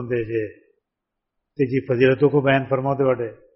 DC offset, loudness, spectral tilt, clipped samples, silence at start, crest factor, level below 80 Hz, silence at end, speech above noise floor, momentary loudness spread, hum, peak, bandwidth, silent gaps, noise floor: under 0.1%; -20 LUFS; -6 dB/octave; under 0.1%; 0 s; 18 dB; -56 dBFS; 0.2 s; 62 dB; 10 LU; none; -4 dBFS; 5.8 kHz; none; -82 dBFS